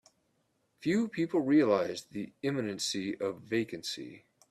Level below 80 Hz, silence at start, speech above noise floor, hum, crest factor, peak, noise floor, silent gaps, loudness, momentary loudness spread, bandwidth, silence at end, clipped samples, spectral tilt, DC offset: -74 dBFS; 0.8 s; 44 dB; none; 18 dB; -14 dBFS; -75 dBFS; none; -32 LUFS; 13 LU; 14 kHz; 0.3 s; under 0.1%; -5 dB/octave; under 0.1%